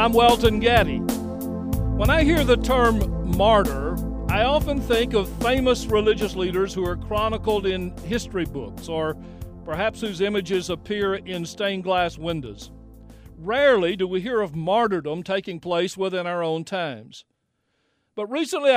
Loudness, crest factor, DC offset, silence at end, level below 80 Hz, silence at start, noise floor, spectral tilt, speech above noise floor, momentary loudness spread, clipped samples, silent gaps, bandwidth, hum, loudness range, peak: -23 LUFS; 18 dB; under 0.1%; 0 s; -34 dBFS; 0 s; -72 dBFS; -5.5 dB/octave; 51 dB; 11 LU; under 0.1%; none; 16 kHz; none; 6 LU; -4 dBFS